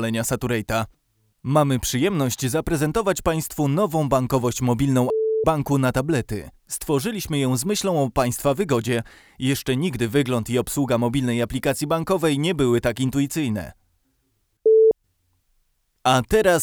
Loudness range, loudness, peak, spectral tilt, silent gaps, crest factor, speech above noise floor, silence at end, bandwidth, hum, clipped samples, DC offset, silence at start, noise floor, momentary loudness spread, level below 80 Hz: 2 LU; -22 LUFS; -4 dBFS; -5.5 dB/octave; none; 16 dB; 48 dB; 0 s; over 20 kHz; none; under 0.1%; under 0.1%; 0 s; -69 dBFS; 7 LU; -44 dBFS